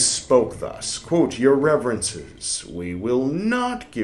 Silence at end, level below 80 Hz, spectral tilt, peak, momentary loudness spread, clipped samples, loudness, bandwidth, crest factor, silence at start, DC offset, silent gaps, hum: 0 s; -50 dBFS; -3.5 dB/octave; -4 dBFS; 10 LU; under 0.1%; -22 LUFS; 12 kHz; 18 dB; 0 s; under 0.1%; none; none